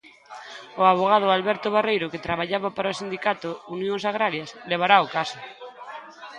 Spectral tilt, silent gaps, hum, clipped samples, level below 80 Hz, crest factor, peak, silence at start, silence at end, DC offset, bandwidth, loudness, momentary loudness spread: -5 dB/octave; none; none; under 0.1%; -64 dBFS; 22 dB; -2 dBFS; 0.3 s; 0 s; under 0.1%; 10.5 kHz; -23 LUFS; 21 LU